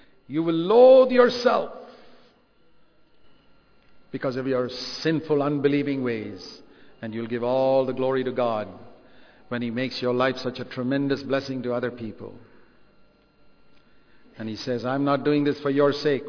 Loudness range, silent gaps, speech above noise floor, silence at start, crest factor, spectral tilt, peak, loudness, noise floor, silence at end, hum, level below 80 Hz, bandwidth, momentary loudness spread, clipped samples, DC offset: 12 LU; none; 37 dB; 0.3 s; 20 dB; -6.5 dB/octave; -4 dBFS; -23 LUFS; -59 dBFS; 0 s; none; -62 dBFS; 5.4 kHz; 18 LU; under 0.1%; under 0.1%